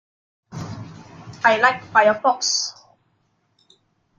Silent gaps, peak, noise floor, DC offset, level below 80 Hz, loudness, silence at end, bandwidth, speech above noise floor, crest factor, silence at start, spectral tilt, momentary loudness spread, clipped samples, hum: none; -2 dBFS; -67 dBFS; under 0.1%; -64 dBFS; -18 LUFS; 1.5 s; 9.6 kHz; 49 dB; 20 dB; 0.5 s; -2 dB/octave; 24 LU; under 0.1%; none